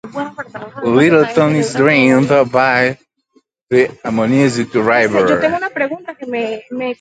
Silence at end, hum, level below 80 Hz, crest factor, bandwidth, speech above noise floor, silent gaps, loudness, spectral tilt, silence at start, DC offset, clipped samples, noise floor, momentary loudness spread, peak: 0.05 s; none; -54 dBFS; 14 dB; 9.2 kHz; 43 dB; 3.63-3.67 s; -14 LUFS; -6 dB/octave; 0.05 s; under 0.1%; under 0.1%; -57 dBFS; 14 LU; 0 dBFS